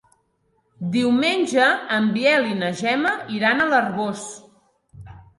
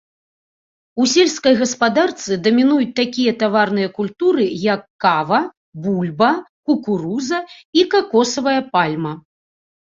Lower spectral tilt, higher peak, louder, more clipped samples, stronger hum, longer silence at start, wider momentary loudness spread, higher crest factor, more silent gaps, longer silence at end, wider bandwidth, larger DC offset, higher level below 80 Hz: about the same, -4.5 dB/octave vs -4.5 dB/octave; second, -6 dBFS vs -2 dBFS; second, -20 LUFS vs -17 LUFS; neither; neither; second, 0.8 s vs 0.95 s; about the same, 9 LU vs 8 LU; about the same, 16 dB vs 16 dB; second, none vs 4.90-4.99 s, 5.57-5.72 s, 6.49-6.63 s, 7.65-7.73 s; second, 0.15 s vs 0.7 s; first, 11.5 kHz vs 7.8 kHz; neither; about the same, -60 dBFS vs -60 dBFS